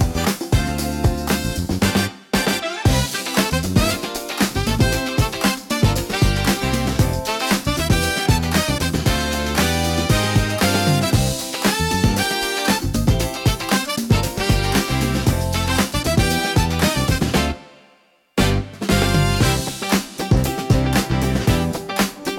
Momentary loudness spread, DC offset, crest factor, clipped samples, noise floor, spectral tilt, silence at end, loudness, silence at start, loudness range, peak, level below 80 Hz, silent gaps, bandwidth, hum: 4 LU; under 0.1%; 16 dB; under 0.1%; -56 dBFS; -4.5 dB/octave; 0 s; -19 LUFS; 0 s; 2 LU; -4 dBFS; -28 dBFS; none; 18 kHz; none